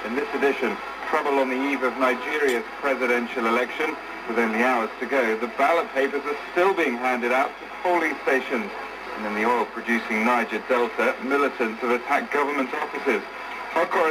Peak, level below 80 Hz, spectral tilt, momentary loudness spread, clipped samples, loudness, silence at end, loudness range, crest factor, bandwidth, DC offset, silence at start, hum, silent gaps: -8 dBFS; -62 dBFS; -4 dB/octave; 6 LU; under 0.1%; -24 LUFS; 0 s; 1 LU; 16 dB; 15.5 kHz; under 0.1%; 0 s; none; none